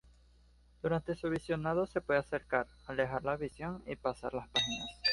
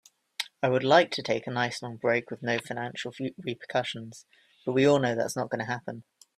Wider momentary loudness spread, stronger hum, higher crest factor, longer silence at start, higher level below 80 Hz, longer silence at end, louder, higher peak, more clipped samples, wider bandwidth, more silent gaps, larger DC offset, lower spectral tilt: second, 8 LU vs 15 LU; first, 60 Hz at -60 dBFS vs none; about the same, 20 dB vs 22 dB; first, 0.85 s vs 0.4 s; first, -58 dBFS vs -70 dBFS; second, 0 s vs 0.35 s; second, -36 LUFS vs -28 LUFS; second, -16 dBFS vs -6 dBFS; neither; second, 11.5 kHz vs 14.5 kHz; neither; neither; about the same, -4.5 dB/octave vs -5 dB/octave